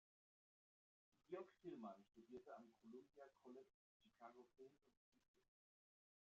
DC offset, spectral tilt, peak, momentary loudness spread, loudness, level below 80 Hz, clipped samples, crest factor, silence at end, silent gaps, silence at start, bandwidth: under 0.1%; -5.5 dB/octave; -42 dBFS; 9 LU; -62 LUFS; under -90 dBFS; under 0.1%; 22 dB; 0.85 s; 3.74-4.00 s, 4.97-5.12 s, 5.28-5.34 s; 1.15 s; 7 kHz